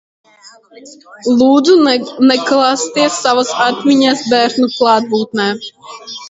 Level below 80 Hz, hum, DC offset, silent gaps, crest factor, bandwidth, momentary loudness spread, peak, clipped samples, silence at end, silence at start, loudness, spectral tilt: -58 dBFS; none; under 0.1%; none; 12 dB; 8 kHz; 9 LU; 0 dBFS; under 0.1%; 0 s; 0.75 s; -12 LUFS; -3.5 dB/octave